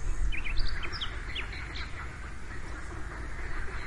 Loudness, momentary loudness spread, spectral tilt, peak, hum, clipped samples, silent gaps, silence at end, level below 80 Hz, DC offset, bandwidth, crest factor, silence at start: -38 LUFS; 7 LU; -4 dB/octave; -14 dBFS; none; under 0.1%; none; 0 s; -34 dBFS; 0.4%; 11 kHz; 18 dB; 0 s